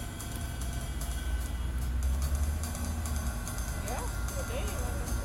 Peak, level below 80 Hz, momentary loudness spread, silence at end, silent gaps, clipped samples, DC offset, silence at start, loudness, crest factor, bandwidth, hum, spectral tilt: -20 dBFS; -34 dBFS; 5 LU; 0 s; none; under 0.1%; under 0.1%; 0 s; -35 LUFS; 12 dB; 16.5 kHz; none; -4.5 dB/octave